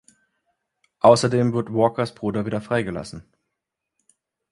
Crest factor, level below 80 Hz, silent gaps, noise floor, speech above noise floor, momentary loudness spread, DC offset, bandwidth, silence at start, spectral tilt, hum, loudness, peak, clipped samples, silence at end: 22 dB; -56 dBFS; none; -82 dBFS; 62 dB; 16 LU; under 0.1%; 11.5 kHz; 1.05 s; -6 dB/octave; none; -21 LUFS; 0 dBFS; under 0.1%; 1.3 s